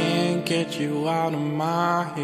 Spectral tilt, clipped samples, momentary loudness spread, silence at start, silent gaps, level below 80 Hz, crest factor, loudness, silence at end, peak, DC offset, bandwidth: -5.5 dB/octave; under 0.1%; 3 LU; 0 s; none; -68 dBFS; 14 dB; -24 LUFS; 0 s; -8 dBFS; under 0.1%; 15 kHz